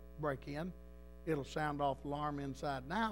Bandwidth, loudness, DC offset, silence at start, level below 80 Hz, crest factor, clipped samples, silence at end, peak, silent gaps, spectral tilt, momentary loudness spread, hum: 16 kHz; -41 LUFS; 0.1%; 0 s; -56 dBFS; 18 dB; under 0.1%; 0 s; -24 dBFS; none; -6.5 dB/octave; 10 LU; 60 Hz at -55 dBFS